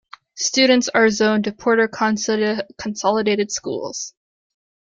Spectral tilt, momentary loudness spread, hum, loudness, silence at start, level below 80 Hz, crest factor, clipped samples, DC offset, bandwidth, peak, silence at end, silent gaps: -3 dB/octave; 12 LU; none; -19 LUFS; 0.35 s; -60 dBFS; 18 dB; under 0.1%; under 0.1%; 9.2 kHz; -2 dBFS; 0.8 s; none